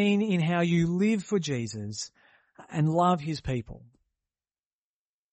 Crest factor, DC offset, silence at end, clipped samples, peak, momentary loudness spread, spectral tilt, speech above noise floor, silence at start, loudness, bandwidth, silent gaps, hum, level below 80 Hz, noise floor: 16 dB; under 0.1%; 1.55 s; under 0.1%; -14 dBFS; 12 LU; -6.5 dB/octave; over 63 dB; 0 s; -27 LUFS; 8.4 kHz; none; none; -56 dBFS; under -90 dBFS